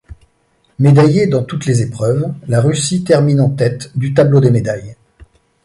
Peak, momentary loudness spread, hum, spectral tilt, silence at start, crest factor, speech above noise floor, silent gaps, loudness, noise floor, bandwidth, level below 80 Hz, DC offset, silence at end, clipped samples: 0 dBFS; 8 LU; none; -7 dB/octave; 0.1 s; 12 dB; 46 dB; none; -13 LUFS; -58 dBFS; 11.5 kHz; -46 dBFS; under 0.1%; 0.4 s; under 0.1%